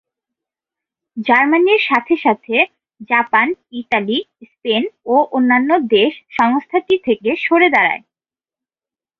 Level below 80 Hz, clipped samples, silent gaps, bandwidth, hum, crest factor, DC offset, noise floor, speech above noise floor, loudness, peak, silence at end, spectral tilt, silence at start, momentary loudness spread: -62 dBFS; under 0.1%; none; 6.8 kHz; none; 16 dB; under 0.1%; under -90 dBFS; over 75 dB; -15 LUFS; -2 dBFS; 1.2 s; -6 dB/octave; 1.15 s; 8 LU